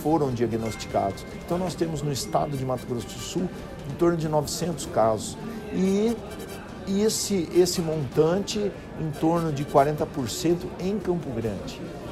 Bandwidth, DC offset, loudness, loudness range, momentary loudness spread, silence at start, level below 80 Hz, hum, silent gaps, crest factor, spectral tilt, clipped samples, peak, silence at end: 15.5 kHz; under 0.1%; -26 LUFS; 4 LU; 11 LU; 0 s; -48 dBFS; none; none; 18 dB; -5.5 dB/octave; under 0.1%; -6 dBFS; 0 s